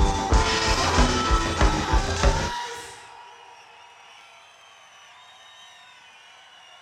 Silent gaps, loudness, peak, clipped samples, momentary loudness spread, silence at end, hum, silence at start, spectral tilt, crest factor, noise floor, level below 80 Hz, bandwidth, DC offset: none; -23 LUFS; -6 dBFS; under 0.1%; 25 LU; 3.25 s; none; 0 s; -4 dB/octave; 20 dB; -50 dBFS; -28 dBFS; 12.5 kHz; under 0.1%